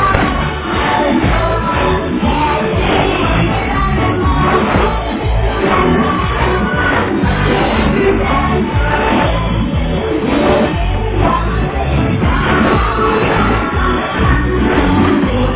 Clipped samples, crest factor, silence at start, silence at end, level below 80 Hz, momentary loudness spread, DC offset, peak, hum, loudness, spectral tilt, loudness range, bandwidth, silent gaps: under 0.1%; 12 dB; 0 s; 0 s; -20 dBFS; 4 LU; under 0.1%; 0 dBFS; none; -13 LUFS; -10.5 dB/octave; 1 LU; 4 kHz; none